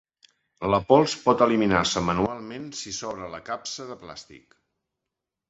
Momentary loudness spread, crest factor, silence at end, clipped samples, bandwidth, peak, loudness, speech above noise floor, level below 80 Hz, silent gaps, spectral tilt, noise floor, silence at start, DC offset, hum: 17 LU; 22 dB; 1.1 s; under 0.1%; 8.2 kHz; -4 dBFS; -24 LUFS; 61 dB; -52 dBFS; none; -4.5 dB/octave; -85 dBFS; 0.6 s; under 0.1%; none